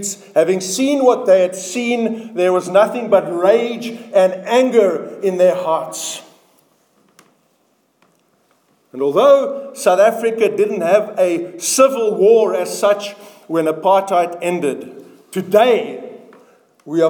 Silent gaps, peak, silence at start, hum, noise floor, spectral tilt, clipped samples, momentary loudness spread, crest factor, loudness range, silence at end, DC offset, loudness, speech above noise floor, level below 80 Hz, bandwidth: none; 0 dBFS; 0 s; none; -61 dBFS; -4 dB/octave; under 0.1%; 11 LU; 16 dB; 7 LU; 0 s; under 0.1%; -15 LUFS; 46 dB; -72 dBFS; 19 kHz